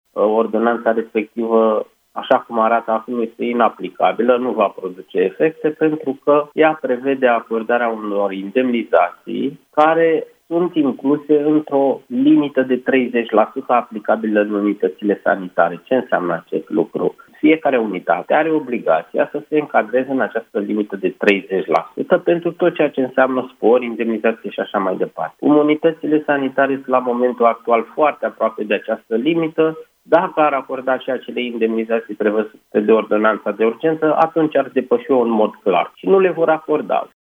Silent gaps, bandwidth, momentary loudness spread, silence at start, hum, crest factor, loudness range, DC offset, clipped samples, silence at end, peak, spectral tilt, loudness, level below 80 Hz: none; 5.2 kHz; 6 LU; 0.15 s; none; 16 dB; 2 LU; under 0.1%; under 0.1%; 0.15 s; 0 dBFS; -8 dB/octave; -17 LUFS; -72 dBFS